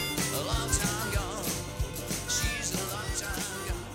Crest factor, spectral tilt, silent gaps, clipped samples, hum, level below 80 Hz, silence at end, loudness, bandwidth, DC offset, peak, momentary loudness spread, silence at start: 18 dB; -3 dB/octave; none; under 0.1%; none; -38 dBFS; 0 s; -31 LUFS; 17 kHz; under 0.1%; -14 dBFS; 6 LU; 0 s